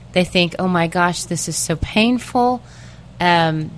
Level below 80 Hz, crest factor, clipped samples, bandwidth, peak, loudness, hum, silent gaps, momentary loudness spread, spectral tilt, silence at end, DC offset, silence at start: -40 dBFS; 18 dB; under 0.1%; 11 kHz; 0 dBFS; -18 LUFS; none; none; 5 LU; -4.5 dB/octave; 0 s; 0.2%; 0 s